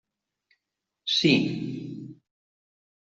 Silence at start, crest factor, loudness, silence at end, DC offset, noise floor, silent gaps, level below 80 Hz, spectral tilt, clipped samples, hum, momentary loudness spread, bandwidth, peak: 1.05 s; 22 dB; -25 LUFS; 0.95 s; under 0.1%; -85 dBFS; none; -68 dBFS; -5 dB/octave; under 0.1%; none; 20 LU; 7.8 kHz; -8 dBFS